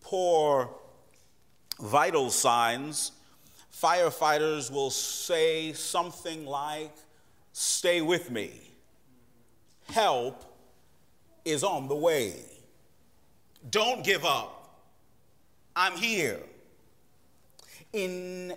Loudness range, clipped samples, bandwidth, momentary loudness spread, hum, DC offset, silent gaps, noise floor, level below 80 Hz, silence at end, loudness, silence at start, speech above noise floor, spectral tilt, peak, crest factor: 6 LU; under 0.1%; 16 kHz; 14 LU; none; under 0.1%; none; -67 dBFS; -70 dBFS; 0 s; -28 LUFS; 0.05 s; 38 dB; -2.5 dB/octave; -10 dBFS; 20 dB